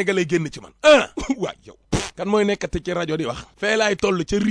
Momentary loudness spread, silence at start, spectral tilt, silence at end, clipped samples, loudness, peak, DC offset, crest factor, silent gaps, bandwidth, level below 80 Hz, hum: 12 LU; 0 s; -4.5 dB/octave; 0 s; under 0.1%; -21 LUFS; -4 dBFS; under 0.1%; 18 dB; none; 10.5 kHz; -42 dBFS; none